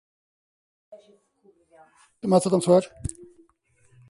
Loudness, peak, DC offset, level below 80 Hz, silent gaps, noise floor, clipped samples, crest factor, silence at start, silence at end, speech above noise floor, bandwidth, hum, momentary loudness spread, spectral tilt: -22 LUFS; -6 dBFS; under 0.1%; -54 dBFS; none; -63 dBFS; under 0.1%; 22 dB; 0.9 s; 0.85 s; 39 dB; 11.5 kHz; none; 17 LU; -6.5 dB/octave